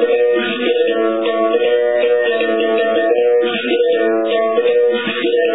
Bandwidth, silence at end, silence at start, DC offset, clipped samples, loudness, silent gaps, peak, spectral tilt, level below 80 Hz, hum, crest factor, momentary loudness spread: 4 kHz; 0 s; 0 s; 0.4%; under 0.1%; -15 LUFS; none; -2 dBFS; -7.5 dB/octave; -70 dBFS; none; 12 dB; 3 LU